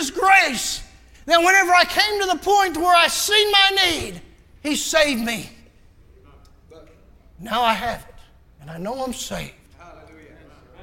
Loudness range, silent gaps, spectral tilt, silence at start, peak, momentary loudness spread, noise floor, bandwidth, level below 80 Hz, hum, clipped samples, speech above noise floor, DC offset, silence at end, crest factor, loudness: 12 LU; none; -1.5 dB/octave; 0 s; -2 dBFS; 18 LU; -50 dBFS; 17 kHz; -48 dBFS; none; under 0.1%; 31 dB; under 0.1%; 0.9 s; 20 dB; -17 LUFS